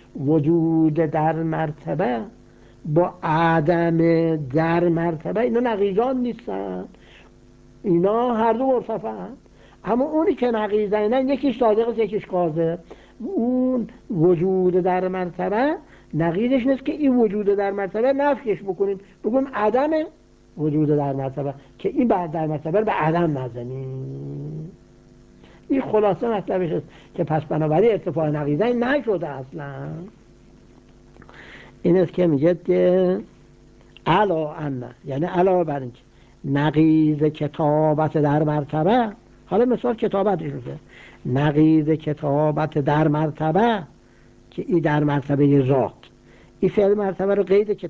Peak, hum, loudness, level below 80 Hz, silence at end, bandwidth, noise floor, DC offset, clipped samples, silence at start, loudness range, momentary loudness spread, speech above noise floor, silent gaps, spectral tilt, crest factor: -6 dBFS; none; -21 LUFS; -52 dBFS; 0 s; 7.2 kHz; -51 dBFS; under 0.1%; under 0.1%; 0.15 s; 4 LU; 13 LU; 30 dB; none; -9.5 dB/octave; 16 dB